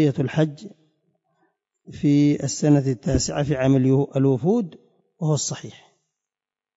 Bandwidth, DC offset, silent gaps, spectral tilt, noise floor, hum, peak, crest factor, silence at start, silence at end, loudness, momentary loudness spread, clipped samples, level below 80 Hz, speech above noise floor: 8 kHz; under 0.1%; none; -6.5 dB/octave; under -90 dBFS; none; -8 dBFS; 14 dB; 0 s; 1.05 s; -21 LUFS; 10 LU; under 0.1%; -46 dBFS; over 70 dB